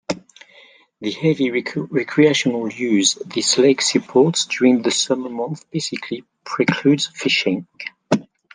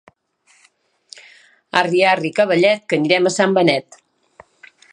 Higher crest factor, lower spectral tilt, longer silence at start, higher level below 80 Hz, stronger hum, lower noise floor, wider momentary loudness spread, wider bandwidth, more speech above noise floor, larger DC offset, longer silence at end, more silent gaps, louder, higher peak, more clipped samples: about the same, 18 dB vs 18 dB; about the same, -4 dB/octave vs -4.5 dB/octave; second, 0.1 s vs 1.75 s; about the same, -66 dBFS vs -70 dBFS; neither; second, -50 dBFS vs -58 dBFS; first, 13 LU vs 4 LU; about the same, 10 kHz vs 11 kHz; second, 31 dB vs 43 dB; neither; second, 0.3 s vs 1.1 s; neither; about the same, -18 LUFS vs -16 LUFS; about the same, -2 dBFS vs 0 dBFS; neither